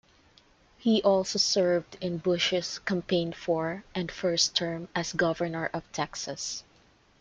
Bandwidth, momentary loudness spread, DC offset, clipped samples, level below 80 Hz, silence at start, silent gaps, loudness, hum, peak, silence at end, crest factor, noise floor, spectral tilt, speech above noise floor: 9.4 kHz; 10 LU; under 0.1%; under 0.1%; -62 dBFS; 0.8 s; none; -28 LUFS; none; -8 dBFS; 0.6 s; 20 dB; -62 dBFS; -3.5 dB/octave; 33 dB